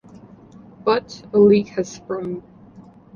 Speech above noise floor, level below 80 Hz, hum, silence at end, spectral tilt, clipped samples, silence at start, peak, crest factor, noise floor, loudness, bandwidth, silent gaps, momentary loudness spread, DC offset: 26 dB; -56 dBFS; none; 0.75 s; -6.5 dB/octave; under 0.1%; 0.85 s; -4 dBFS; 18 dB; -45 dBFS; -20 LUFS; 7.2 kHz; none; 15 LU; under 0.1%